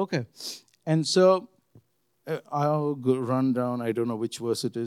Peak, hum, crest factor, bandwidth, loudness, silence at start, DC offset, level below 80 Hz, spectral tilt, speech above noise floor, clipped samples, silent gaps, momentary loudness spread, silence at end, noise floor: -8 dBFS; none; 18 dB; 15 kHz; -26 LUFS; 0 s; under 0.1%; -84 dBFS; -6 dB/octave; 36 dB; under 0.1%; none; 16 LU; 0 s; -62 dBFS